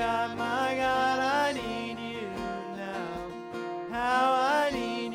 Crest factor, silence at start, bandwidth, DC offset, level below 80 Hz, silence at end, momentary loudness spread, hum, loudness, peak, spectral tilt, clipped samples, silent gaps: 16 dB; 0 s; 16.5 kHz; under 0.1%; -56 dBFS; 0 s; 12 LU; none; -29 LUFS; -14 dBFS; -4 dB/octave; under 0.1%; none